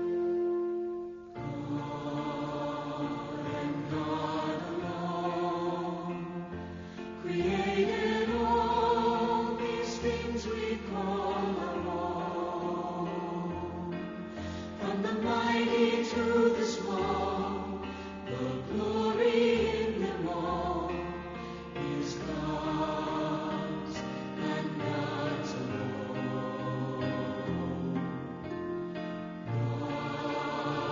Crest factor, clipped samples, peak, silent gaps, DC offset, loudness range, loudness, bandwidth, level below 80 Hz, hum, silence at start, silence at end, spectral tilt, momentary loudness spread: 18 dB; under 0.1%; -14 dBFS; none; under 0.1%; 5 LU; -33 LUFS; 7.2 kHz; -54 dBFS; none; 0 s; 0 s; -5 dB/octave; 11 LU